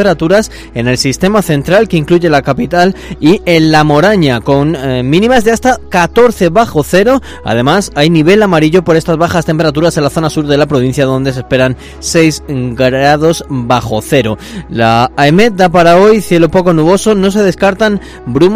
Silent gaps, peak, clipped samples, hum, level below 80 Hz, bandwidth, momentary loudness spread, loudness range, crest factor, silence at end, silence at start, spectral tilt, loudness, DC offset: none; 0 dBFS; 2%; none; -32 dBFS; 16 kHz; 6 LU; 3 LU; 8 dB; 0 s; 0 s; -5.5 dB/octave; -9 LUFS; under 0.1%